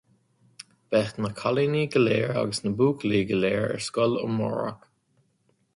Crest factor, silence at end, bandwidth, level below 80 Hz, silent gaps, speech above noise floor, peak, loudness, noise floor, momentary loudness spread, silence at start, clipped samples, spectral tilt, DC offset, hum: 16 dB; 1 s; 11.5 kHz; -60 dBFS; none; 44 dB; -10 dBFS; -25 LUFS; -69 dBFS; 6 LU; 0.6 s; under 0.1%; -6 dB/octave; under 0.1%; none